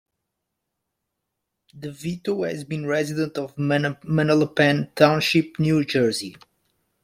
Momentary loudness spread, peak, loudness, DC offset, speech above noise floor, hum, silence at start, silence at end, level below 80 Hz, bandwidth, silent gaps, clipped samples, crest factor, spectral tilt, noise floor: 12 LU; -2 dBFS; -22 LUFS; under 0.1%; 59 dB; none; 1.75 s; 0.75 s; -60 dBFS; 15 kHz; none; under 0.1%; 22 dB; -6 dB/octave; -80 dBFS